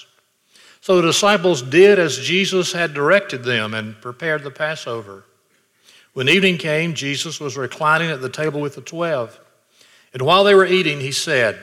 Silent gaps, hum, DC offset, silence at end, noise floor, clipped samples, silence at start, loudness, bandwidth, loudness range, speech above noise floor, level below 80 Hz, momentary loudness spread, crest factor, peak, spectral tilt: none; none; under 0.1%; 0 s; -61 dBFS; under 0.1%; 0.85 s; -17 LUFS; 15 kHz; 6 LU; 44 dB; -66 dBFS; 15 LU; 18 dB; -2 dBFS; -4 dB/octave